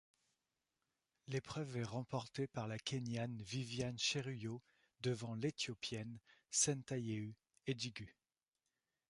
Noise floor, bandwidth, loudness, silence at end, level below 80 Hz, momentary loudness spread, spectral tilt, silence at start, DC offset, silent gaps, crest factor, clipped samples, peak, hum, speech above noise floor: under -90 dBFS; 11.5 kHz; -43 LUFS; 1 s; -74 dBFS; 13 LU; -4 dB/octave; 1.3 s; under 0.1%; none; 22 dB; under 0.1%; -22 dBFS; none; over 47 dB